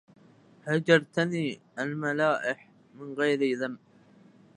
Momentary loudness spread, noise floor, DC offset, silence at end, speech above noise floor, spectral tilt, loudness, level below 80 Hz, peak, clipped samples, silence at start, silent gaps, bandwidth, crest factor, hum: 17 LU; -57 dBFS; under 0.1%; 0.8 s; 30 dB; -6 dB/octave; -28 LUFS; -78 dBFS; -6 dBFS; under 0.1%; 0.65 s; none; 10.5 kHz; 22 dB; none